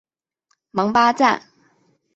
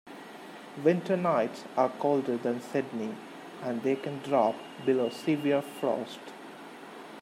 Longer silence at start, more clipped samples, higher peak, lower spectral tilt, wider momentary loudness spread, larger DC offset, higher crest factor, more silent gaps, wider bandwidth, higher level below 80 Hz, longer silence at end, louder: first, 0.75 s vs 0.05 s; neither; first, -2 dBFS vs -10 dBFS; second, -4.5 dB/octave vs -6.5 dB/octave; second, 12 LU vs 18 LU; neither; about the same, 20 dB vs 20 dB; neither; second, 8 kHz vs 16 kHz; first, -62 dBFS vs -82 dBFS; first, 0.75 s vs 0 s; first, -18 LUFS vs -30 LUFS